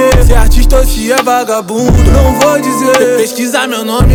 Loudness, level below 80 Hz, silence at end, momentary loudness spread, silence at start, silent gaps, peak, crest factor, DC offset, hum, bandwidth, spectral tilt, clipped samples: -9 LUFS; -10 dBFS; 0 s; 5 LU; 0 s; none; 0 dBFS; 8 dB; under 0.1%; none; 19.5 kHz; -5 dB/octave; 5%